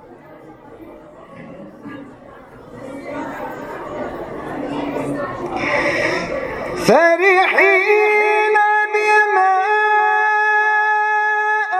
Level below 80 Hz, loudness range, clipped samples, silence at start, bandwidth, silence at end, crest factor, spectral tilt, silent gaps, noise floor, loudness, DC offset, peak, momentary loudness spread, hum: -50 dBFS; 19 LU; under 0.1%; 0.05 s; 13.5 kHz; 0 s; 18 dB; -4.5 dB/octave; none; -40 dBFS; -15 LUFS; under 0.1%; 0 dBFS; 21 LU; none